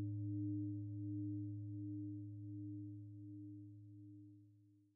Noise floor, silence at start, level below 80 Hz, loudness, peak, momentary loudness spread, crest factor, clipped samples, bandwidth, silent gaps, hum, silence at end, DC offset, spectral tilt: -69 dBFS; 0 s; -86 dBFS; -48 LUFS; -36 dBFS; 15 LU; 12 dB; under 0.1%; 0.6 kHz; none; none; 0.1 s; under 0.1%; -12.5 dB/octave